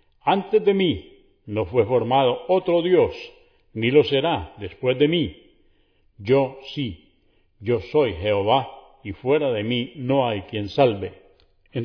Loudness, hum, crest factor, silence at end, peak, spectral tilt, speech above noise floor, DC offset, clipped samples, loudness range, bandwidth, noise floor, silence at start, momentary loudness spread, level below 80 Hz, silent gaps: -22 LUFS; none; 18 dB; 0 s; -4 dBFS; -8.5 dB/octave; 40 dB; under 0.1%; under 0.1%; 4 LU; 5.4 kHz; -61 dBFS; 0.25 s; 15 LU; -52 dBFS; none